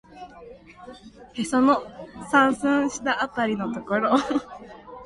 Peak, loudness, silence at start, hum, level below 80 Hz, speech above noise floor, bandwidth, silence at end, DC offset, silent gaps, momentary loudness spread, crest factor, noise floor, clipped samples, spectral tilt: -6 dBFS; -23 LUFS; 0.1 s; none; -58 dBFS; 22 dB; 11.5 kHz; 0 s; under 0.1%; none; 23 LU; 20 dB; -45 dBFS; under 0.1%; -4.5 dB/octave